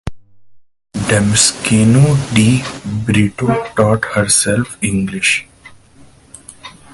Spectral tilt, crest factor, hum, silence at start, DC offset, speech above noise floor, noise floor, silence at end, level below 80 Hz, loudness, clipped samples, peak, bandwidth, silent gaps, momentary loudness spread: -4.5 dB/octave; 16 dB; none; 0.05 s; under 0.1%; 31 dB; -45 dBFS; 0.25 s; -38 dBFS; -13 LUFS; under 0.1%; 0 dBFS; 12 kHz; none; 11 LU